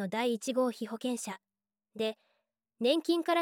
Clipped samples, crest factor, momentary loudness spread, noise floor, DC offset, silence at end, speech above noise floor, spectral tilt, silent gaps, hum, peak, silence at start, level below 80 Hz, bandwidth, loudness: under 0.1%; 18 dB; 16 LU; -80 dBFS; under 0.1%; 0 s; 48 dB; -4 dB/octave; none; none; -14 dBFS; 0 s; -88 dBFS; 17 kHz; -33 LUFS